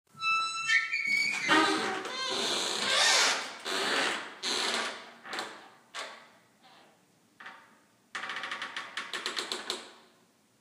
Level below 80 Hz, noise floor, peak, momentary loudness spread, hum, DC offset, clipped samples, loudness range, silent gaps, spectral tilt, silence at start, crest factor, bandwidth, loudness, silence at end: -86 dBFS; -65 dBFS; -10 dBFS; 18 LU; none; under 0.1%; under 0.1%; 16 LU; none; 0 dB/octave; 0.15 s; 22 dB; 15.5 kHz; -29 LUFS; 0.6 s